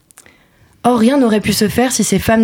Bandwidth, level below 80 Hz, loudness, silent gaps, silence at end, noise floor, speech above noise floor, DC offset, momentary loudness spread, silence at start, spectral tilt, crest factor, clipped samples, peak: 18 kHz; -40 dBFS; -13 LUFS; none; 0 s; -50 dBFS; 38 dB; under 0.1%; 4 LU; 0.85 s; -4.5 dB/octave; 12 dB; under 0.1%; -2 dBFS